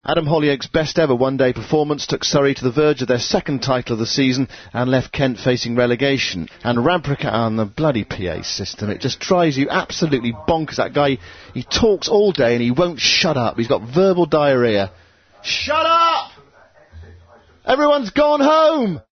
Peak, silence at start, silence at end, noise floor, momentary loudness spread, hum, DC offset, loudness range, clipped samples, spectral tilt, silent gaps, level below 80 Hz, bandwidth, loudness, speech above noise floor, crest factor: -2 dBFS; 0.05 s; 0.1 s; -50 dBFS; 9 LU; none; under 0.1%; 3 LU; under 0.1%; -5 dB/octave; none; -46 dBFS; 6.6 kHz; -18 LUFS; 32 dB; 16 dB